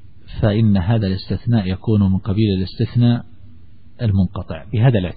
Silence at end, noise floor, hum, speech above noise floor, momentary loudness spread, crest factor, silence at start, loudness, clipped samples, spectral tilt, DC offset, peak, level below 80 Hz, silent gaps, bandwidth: 0 s; -46 dBFS; none; 29 dB; 7 LU; 14 dB; 0.3 s; -18 LUFS; under 0.1%; -13 dB/octave; 1%; -4 dBFS; -38 dBFS; none; 4.9 kHz